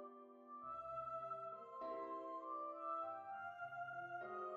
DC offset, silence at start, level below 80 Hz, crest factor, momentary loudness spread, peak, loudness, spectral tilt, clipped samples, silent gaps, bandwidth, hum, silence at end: under 0.1%; 0 s; -86 dBFS; 14 dB; 6 LU; -36 dBFS; -49 LUFS; -6.5 dB/octave; under 0.1%; none; 7.8 kHz; none; 0 s